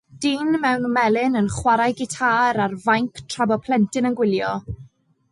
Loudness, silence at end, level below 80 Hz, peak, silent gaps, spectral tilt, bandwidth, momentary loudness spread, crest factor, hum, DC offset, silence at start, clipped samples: -20 LUFS; 0.45 s; -48 dBFS; -6 dBFS; none; -5 dB/octave; 11.5 kHz; 7 LU; 14 dB; none; under 0.1%; 0.15 s; under 0.1%